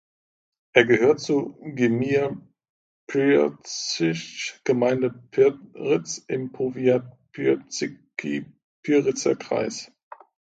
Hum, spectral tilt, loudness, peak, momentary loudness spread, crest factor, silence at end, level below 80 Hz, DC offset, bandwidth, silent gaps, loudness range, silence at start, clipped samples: none; -5 dB/octave; -24 LUFS; 0 dBFS; 12 LU; 24 dB; 0.75 s; -66 dBFS; under 0.1%; 9 kHz; 2.69-3.07 s, 8.64-8.83 s; 4 LU; 0.75 s; under 0.1%